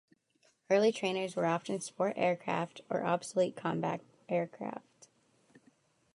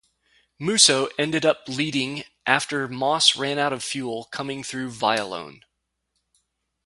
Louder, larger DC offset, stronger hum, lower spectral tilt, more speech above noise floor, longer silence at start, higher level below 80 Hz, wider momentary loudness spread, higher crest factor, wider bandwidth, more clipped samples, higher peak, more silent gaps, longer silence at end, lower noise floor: second, -34 LUFS vs -22 LUFS; neither; neither; first, -5 dB/octave vs -2 dB/octave; second, 39 dB vs 54 dB; about the same, 0.7 s vs 0.6 s; second, -84 dBFS vs -66 dBFS; second, 11 LU vs 15 LU; second, 18 dB vs 24 dB; about the same, 11.5 kHz vs 11.5 kHz; neither; second, -16 dBFS vs 0 dBFS; neither; about the same, 1.35 s vs 1.35 s; second, -72 dBFS vs -77 dBFS